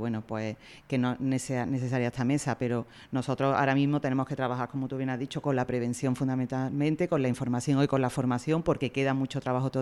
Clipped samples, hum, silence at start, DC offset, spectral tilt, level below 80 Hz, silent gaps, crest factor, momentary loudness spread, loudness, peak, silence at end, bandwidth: under 0.1%; none; 0 s; under 0.1%; -6.5 dB/octave; -60 dBFS; none; 16 dB; 7 LU; -29 LUFS; -12 dBFS; 0 s; 12.5 kHz